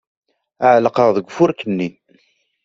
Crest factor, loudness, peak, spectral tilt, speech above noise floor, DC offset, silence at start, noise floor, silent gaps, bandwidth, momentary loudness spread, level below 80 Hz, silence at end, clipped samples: 16 dB; -16 LUFS; -2 dBFS; -7 dB/octave; 44 dB; under 0.1%; 0.6 s; -59 dBFS; none; 7.6 kHz; 10 LU; -62 dBFS; 0.75 s; under 0.1%